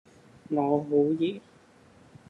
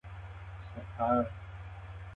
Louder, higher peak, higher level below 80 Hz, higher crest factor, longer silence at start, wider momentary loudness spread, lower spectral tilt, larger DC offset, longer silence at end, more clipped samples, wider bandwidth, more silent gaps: first, -27 LUFS vs -34 LUFS; first, -12 dBFS vs -16 dBFS; second, -74 dBFS vs -50 dBFS; about the same, 18 dB vs 20 dB; first, 0.5 s vs 0.05 s; second, 8 LU vs 16 LU; about the same, -8.5 dB/octave vs -9.5 dB/octave; neither; first, 0.9 s vs 0 s; neither; first, 7.4 kHz vs 6.6 kHz; neither